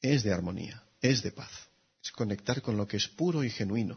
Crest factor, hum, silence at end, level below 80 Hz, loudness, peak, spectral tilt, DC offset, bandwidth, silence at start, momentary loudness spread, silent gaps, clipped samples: 20 dB; none; 0 s; -62 dBFS; -31 LUFS; -10 dBFS; -5 dB/octave; under 0.1%; 6.6 kHz; 0 s; 15 LU; none; under 0.1%